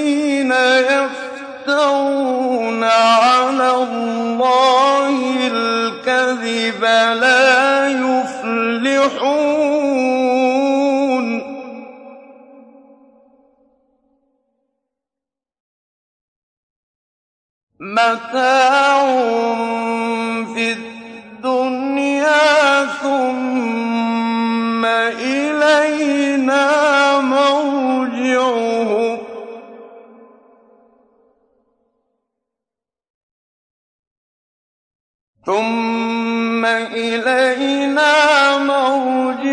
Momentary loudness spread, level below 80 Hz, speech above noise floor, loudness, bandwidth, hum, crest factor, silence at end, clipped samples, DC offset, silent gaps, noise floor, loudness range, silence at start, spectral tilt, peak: 9 LU; -70 dBFS; 73 dB; -15 LUFS; 10.5 kHz; none; 14 dB; 0 s; under 0.1%; under 0.1%; 15.60-17.67 s, 33.10-35.34 s; -87 dBFS; 8 LU; 0 s; -3 dB/octave; -2 dBFS